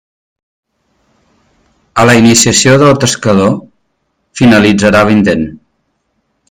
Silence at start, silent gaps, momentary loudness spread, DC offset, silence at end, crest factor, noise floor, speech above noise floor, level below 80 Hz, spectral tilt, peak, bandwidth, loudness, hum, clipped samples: 1.95 s; none; 12 LU; under 0.1%; 0.95 s; 10 dB; -63 dBFS; 56 dB; -42 dBFS; -4.5 dB/octave; 0 dBFS; 20 kHz; -8 LUFS; none; 0.6%